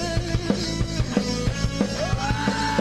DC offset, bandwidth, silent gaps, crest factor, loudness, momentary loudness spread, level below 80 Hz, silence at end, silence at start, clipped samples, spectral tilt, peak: under 0.1%; 12.5 kHz; none; 18 dB; -25 LUFS; 2 LU; -32 dBFS; 0 s; 0 s; under 0.1%; -5 dB/octave; -6 dBFS